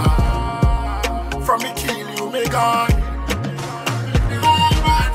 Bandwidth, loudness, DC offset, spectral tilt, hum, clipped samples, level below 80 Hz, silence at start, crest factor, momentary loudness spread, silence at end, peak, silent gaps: 16 kHz; -19 LUFS; under 0.1%; -5 dB/octave; none; under 0.1%; -22 dBFS; 0 s; 16 dB; 8 LU; 0 s; -2 dBFS; none